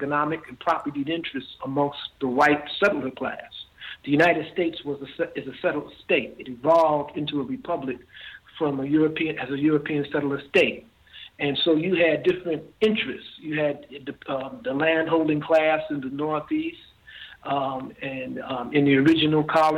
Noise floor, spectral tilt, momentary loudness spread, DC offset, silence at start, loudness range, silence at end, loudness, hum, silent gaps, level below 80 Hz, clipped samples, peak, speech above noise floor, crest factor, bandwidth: -45 dBFS; -6.5 dB/octave; 15 LU; under 0.1%; 0 s; 2 LU; 0 s; -24 LUFS; none; none; -60 dBFS; under 0.1%; -6 dBFS; 21 dB; 18 dB; 10.5 kHz